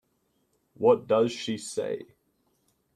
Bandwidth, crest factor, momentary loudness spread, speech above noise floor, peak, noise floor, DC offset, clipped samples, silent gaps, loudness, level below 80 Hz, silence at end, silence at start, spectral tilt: 13 kHz; 20 dB; 11 LU; 47 dB; -8 dBFS; -73 dBFS; under 0.1%; under 0.1%; none; -27 LUFS; -72 dBFS; 0.9 s; 0.8 s; -5 dB/octave